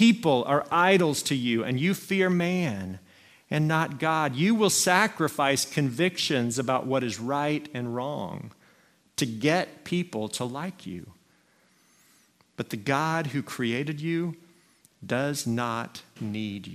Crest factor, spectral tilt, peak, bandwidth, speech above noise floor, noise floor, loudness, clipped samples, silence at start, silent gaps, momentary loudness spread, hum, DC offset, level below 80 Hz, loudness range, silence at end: 22 dB; -4.5 dB/octave; -6 dBFS; 16 kHz; 37 dB; -64 dBFS; -26 LUFS; under 0.1%; 0 s; none; 15 LU; none; under 0.1%; -68 dBFS; 8 LU; 0 s